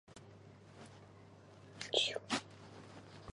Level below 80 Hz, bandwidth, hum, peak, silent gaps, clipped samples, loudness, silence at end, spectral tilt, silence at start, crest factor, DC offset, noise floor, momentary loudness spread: -70 dBFS; 11 kHz; none; -18 dBFS; none; under 0.1%; -37 LUFS; 0.05 s; -2.5 dB/octave; 0.1 s; 28 dB; under 0.1%; -59 dBFS; 25 LU